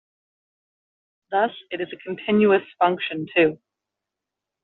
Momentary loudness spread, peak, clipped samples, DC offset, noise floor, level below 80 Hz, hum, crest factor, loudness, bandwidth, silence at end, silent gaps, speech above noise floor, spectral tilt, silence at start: 12 LU; -4 dBFS; under 0.1%; under 0.1%; -86 dBFS; -68 dBFS; none; 20 dB; -22 LUFS; 4.2 kHz; 1.1 s; none; 64 dB; -3.5 dB/octave; 1.3 s